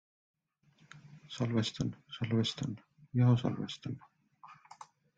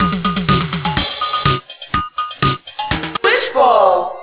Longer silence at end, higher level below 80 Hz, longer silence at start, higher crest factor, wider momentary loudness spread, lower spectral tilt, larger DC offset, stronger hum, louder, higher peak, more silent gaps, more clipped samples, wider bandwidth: first, 0.35 s vs 0 s; second, -68 dBFS vs -36 dBFS; first, 0.95 s vs 0 s; about the same, 20 dB vs 16 dB; first, 26 LU vs 9 LU; second, -6.5 dB/octave vs -9.5 dB/octave; neither; neither; second, -34 LUFS vs -16 LUFS; second, -16 dBFS vs 0 dBFS; neither; neither; first, 7.8 kHz vs 4 kHz